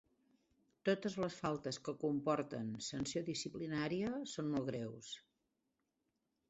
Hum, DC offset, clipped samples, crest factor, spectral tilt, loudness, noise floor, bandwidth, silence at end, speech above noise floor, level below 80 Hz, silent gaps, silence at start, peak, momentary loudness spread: none; under 0.1%; under 0.1%; 20 dB; -5 dB/octave; -41 LUFS; -86 dBFS; 8 kHz; 1.3 s; 46 dB; -72 dBFS; none; 0.85 s; -22 dBFS; 7 LU